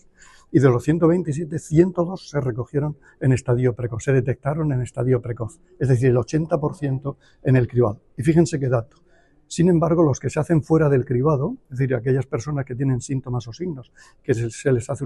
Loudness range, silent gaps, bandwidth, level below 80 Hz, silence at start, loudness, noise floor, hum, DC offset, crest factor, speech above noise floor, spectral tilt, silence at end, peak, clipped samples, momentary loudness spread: 3 LU; none; 11 kHz; -46 dBFS; 0.5 s; -21 LUFS; -50 dBFS; none; under 0.1%; 18 dB; 30 dB; -8 dB/octave; 0 s; -4 dBFS; under 0.1%; 10 LU